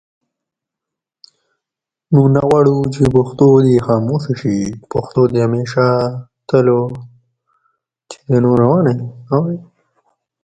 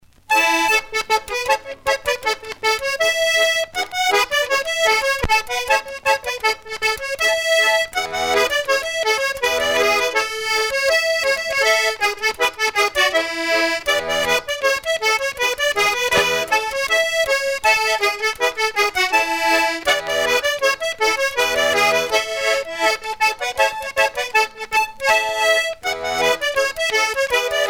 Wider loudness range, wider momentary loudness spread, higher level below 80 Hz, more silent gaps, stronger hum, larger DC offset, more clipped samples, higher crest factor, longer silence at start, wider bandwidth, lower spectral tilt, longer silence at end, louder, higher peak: first, 4 LU vs 1 LU; first, 11 LU vs 4 LU; about the same, -46 dBFS vs -46 dBFS; neither; neither; neither; neither; about the same, 16 dB vs 16 dB; first, 2.1 s vs 0.3 s; second, 9.2 kHz vs over 20 kHz; first, -8.5 dB/octave vs -0.5 dB/octave; first, 0.85 s vs 0 s; first, -14 LUFS vs -18 LUFS; about the same, 0 dBFS vs -2 dBFS